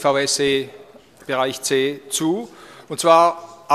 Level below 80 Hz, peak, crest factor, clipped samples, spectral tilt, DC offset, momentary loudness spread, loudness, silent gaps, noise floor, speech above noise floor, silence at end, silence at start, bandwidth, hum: -62 dBFS; 0 dBFS; 20 dB; under 0.1%; -3 dB/octave; under 0.1%; 20 LU; -19 LUFS; none; -45 dBFS; 27 dB; 0 s; 0 s; 15 kHz; none